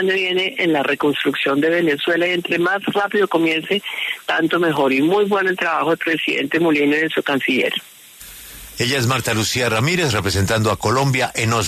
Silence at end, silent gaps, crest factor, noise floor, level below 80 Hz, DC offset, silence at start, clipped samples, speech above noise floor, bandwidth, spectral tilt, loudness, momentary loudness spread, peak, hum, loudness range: 0 s; none; 12 dB; -39 dBFS; -50 dBFS; under 0.1%; 0 s; under 0.1%; 22 dB; 13.5 kHz; -4.5 dB/octave; -18 LUFS; 5 LU; -6 dBFS; none; 2 LU